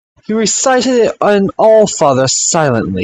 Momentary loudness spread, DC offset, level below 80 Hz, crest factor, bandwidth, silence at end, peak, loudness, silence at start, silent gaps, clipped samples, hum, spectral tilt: 5 LU; under 0.1%; -48 dBFS; 12 dB; 9.6 kHz; 0 s; 0 dBFS; -11 LUFS; 0.3 s; none; under 0.1%; none; -3.5 dB/octave